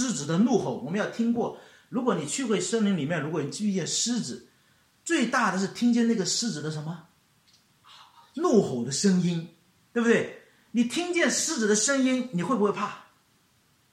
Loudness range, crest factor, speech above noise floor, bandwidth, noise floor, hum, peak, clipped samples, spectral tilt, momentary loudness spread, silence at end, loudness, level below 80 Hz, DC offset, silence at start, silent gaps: 3 LU; 20 dB; 39 dB; 14 kHz; -65 dBFS; none; -8 dBFS; under 0.1%; -4 dB/octave; 11 LU; 0.9 s; -26 LUFS; -72 dBFS; under 0.1%; 0 s; none